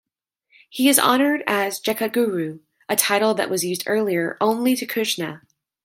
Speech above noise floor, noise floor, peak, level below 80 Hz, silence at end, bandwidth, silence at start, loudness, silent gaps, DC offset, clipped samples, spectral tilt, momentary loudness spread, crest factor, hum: 51 dB; -72 dBFS; 0 dBFS; -72 dBFS; 0.45 s; 16.5 kHz; 0.75 s; -20 LUFS; none; under 0.1%; under 0.1%; -3 dB/octave; 10 LU; 22 dB; none